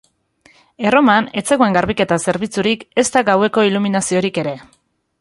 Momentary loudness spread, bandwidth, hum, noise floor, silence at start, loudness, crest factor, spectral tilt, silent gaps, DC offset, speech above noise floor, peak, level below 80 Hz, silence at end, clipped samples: 7 LU; 11.5 kHz; none; -54 dBFS; 0.8 s; -16 LUFS; 16 dB; -4.5 dB/octave; none; under 0.1%; 38 dB; -2 dBFS; -50 dBFS; 0.6 s; under 0.1%